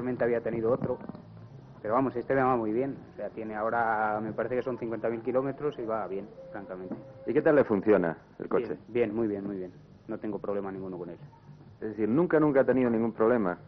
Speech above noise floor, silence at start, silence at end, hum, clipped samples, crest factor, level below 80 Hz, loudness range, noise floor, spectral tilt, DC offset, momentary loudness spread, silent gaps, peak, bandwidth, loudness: 19 dB; 0 s; 0.05 s; none; under 0.1%; 18 dB; -62 dBFS; 5 LU; -48 dBFS; -7.5 dB/octave; under 0.1%; 17 LU; none; -12 dBFS; 5.4 kHz; -29 LUFS